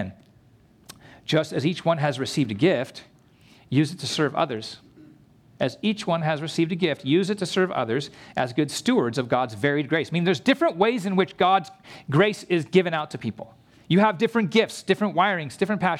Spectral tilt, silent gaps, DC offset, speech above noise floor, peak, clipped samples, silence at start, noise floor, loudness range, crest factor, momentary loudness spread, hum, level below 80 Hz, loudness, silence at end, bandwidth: -5.5 dB/octave; none; under 0.1%; 33 dB; -6 dBFS; under 0.1%; 0 s; -56 dBFS; 4 LU; 18 dB; 11 LU; none; -66 dBFS; -24 LUFS; 0 s; 15 kHz